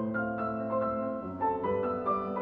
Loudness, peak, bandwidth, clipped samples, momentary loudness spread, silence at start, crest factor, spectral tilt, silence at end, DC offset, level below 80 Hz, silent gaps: -32 LUFS; -18 dBFS; 4.9 kHz; under 0.1%; 3 LU; 0 s; 12 dB; -10.5 dB/octave; 0 s; under 0.1%; -60 dBFS; none